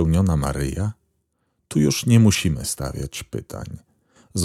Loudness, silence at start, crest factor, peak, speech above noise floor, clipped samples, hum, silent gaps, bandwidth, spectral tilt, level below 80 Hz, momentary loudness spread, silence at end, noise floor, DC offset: -21 LUFS; 0 s; 18 dB; -2 dBFS; 51 dB; under 0.1%; none; none; 15.5 kHz; -5.5 dB/octave; -36 dBFS; 18 LU; 0 s; -71 dBFS; under 0.1%